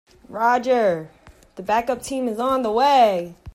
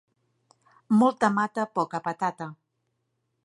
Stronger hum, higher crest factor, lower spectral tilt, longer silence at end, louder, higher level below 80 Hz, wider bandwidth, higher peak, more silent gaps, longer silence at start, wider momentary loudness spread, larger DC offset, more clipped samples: neither; about the same, 16 dB vs 20 dB; second, -4.5 dB/octave vs -6.5 dB/octave; second, 0.05 s vs 0.9 s; first, -20 LUFS vs -25 LUFS; first, -52 dBFS vs -76 dBFS; first, 15.5 kHz vs 11 kHz; first, -4 dBFS vs -8 dBFS; neither; second, 0.3 s vs 0.9 s; about the same, 12 LU vs 11 LU; neither; neither